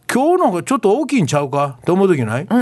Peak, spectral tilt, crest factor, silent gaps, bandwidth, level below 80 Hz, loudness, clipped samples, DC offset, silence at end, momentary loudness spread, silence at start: -2 dBFS; -6 dB/octave; 12 dB; none; 12.5 kHz; -58 dBFS; -16 LUFS; under 0.1%; under 0.1%; 0 s; 4 LU; 0.1 s